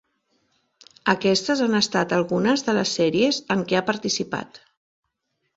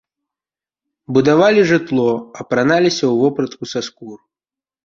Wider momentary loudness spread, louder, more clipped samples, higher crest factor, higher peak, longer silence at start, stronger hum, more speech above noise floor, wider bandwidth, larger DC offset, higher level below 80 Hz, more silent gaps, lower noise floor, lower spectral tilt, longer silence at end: second, 6 LU vs 13 LU; second, -22 LUFS vs -15 LUFS; neither; first, 22 dB vs 16 dB; about the same, -2 dBFS vs -2 dBFS; about the same, 1.05 s vs 1.1 s; neither; second, 54 dB vs over 75 dB; about the same, 8 kHz vs 7.6 kHz; neither; about the same, -62 dBFS vs -58 dBFS; neither; second, -75 dBFS vs under -90 dBFS; second, -4 dB/octave vs -5.5 dB/octave; first, 1 s vs 0.7 s